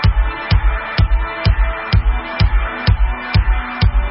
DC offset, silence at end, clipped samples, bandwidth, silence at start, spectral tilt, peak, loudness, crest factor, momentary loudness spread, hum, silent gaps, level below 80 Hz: under 0.1%; 0 s; under 0.1%; 5.8 kHz; 0 s; -10 dB/octave; -2 dBFS; -17 LUFS; 12 dB; 2 LU; none; none; -16 dBFS